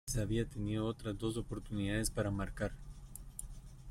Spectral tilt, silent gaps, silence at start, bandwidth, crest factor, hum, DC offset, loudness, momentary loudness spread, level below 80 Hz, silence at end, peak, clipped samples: -5.5 dB/octave; none; 0.05 s; 16 kHz; 16 dB; none; under 0.1%; -39 LUFS; 16 LU; -48 dBFS; 0 s; -22 dBFS; under 0.1%